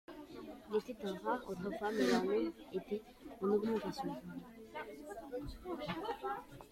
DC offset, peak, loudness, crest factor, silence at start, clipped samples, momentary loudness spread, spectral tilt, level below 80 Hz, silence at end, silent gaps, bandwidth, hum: under 0.1%; -20 dBFS; -40 LUFS; 20 dB; 0.1 s; under 0.1%; 16 LU; -5.5 dB/octave; -64 dBFS; 0.05 s; none; 16.5 kHz; none